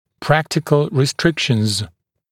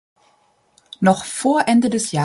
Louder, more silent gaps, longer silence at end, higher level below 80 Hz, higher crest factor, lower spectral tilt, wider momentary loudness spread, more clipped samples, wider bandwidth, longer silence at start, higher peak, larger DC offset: about the same, -18 LUFS vs -18 LUFS; neither; first, 0.45 s vs 0 s; first, -48 dBFS vs -60 dBFS; about the same, 18 dB vs 18 dB; about the same, -5 dB/octave vs -5 dB/octave; about the same, 5 LU vs 4 LU; neither; first, 16 kHz vs 11.5 kHz; second, 0.2 s vs 1 s; about the same, 0 dBFS vs -2 dBFS; neither